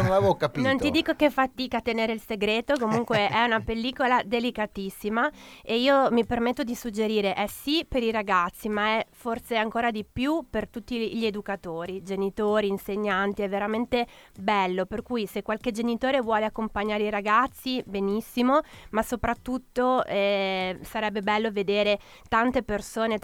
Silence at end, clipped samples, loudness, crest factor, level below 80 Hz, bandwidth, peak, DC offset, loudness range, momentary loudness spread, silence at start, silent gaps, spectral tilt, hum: 0.05 s; under 0.1%; -26 LUFS; 18 dB; -50 dBFS; 18.5 kHz; -8 dBFS; under 0.1%; 3 LU; 8 LU; 0 s; none; -5 dB/octave; none